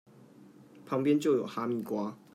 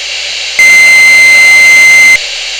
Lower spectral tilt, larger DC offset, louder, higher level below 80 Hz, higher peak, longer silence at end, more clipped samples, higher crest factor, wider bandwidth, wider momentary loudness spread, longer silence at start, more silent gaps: first, -7 dB/octave vs 2 dB/octave; neither; second, -31 LUFS vs 0 LUFS; second, -82 dBFS vs -44 dBFS; second, -16 dBFS vs 0 dBFS; first, 0.2 s vs 0 s; second, under 0.1% vs 10%; first, 18 dB vs 4 dB; second, 15.5 kHz vs over 20 kHz; about the same, 9 LU vs 11 LU; first, 0.4 s vs 0 s; neither